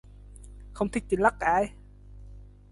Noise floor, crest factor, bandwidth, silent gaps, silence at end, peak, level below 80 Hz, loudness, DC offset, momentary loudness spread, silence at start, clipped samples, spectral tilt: -47 dBFS; 22 dB; 11.5 kHz; none; 0.25 s; -8 dBFS; -46 dBFS; -27 LUFS; under 0.1%; 25 LU; 0.3 s; under 0.1%; -6 dB/octave